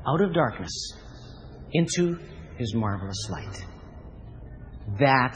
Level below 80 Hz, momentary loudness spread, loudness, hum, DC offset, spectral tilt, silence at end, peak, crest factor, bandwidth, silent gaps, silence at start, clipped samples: -46 dBFS; 21 LU; -27 LUFS; none; under 0.1%; -5.5 dB/octave; 0 s; -6 dBFS; 22 dB; 9.8 kHz; none; 0 s; under 0.1%